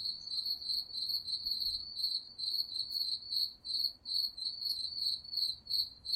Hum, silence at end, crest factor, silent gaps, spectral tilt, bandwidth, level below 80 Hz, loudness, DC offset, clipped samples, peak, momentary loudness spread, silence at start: none; 0 s; 16 dB; none; 0 dB/octave; 16 kHz; -68 dBFS; -34 LUFS; under 0.1%; under 0.1%; -22 dBFS; 2 LU; 0 s